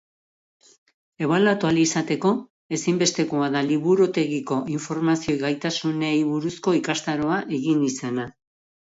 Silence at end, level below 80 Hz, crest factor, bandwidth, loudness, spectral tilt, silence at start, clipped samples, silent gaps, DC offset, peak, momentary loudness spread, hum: 0.7 s; -62 dBFS; 16 dB; 8 kHz; -23 LUFS; -5 dB/octave; 1.2 s; under 0.1%; 2.50-2.69 s; under 0.1%; -8 dBFS; 8 LU; none